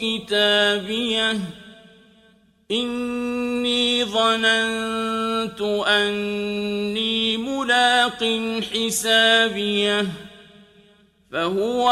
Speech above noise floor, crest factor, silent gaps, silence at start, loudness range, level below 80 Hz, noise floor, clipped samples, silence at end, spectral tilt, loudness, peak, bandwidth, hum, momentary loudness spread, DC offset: 35 dB; 18 dB; none; 0 s; 4 LU; -58 dBFS; -56 dBFS; under 0.1%; 0 s; -2.5 dB/octave; -20 LUFS; -4 dBFS; 14.5 kHz; none; 9 LU; under 0.1%